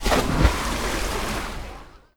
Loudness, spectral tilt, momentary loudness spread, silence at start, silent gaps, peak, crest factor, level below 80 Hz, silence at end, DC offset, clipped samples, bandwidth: -24 LUFS; -4.5 dB/octave; 17 LU; 0 s; none; -4 dBFS; 20 dB; -28 dBFS; 0.2 s; under 0.1%; under 0.1%; 19.5 kHz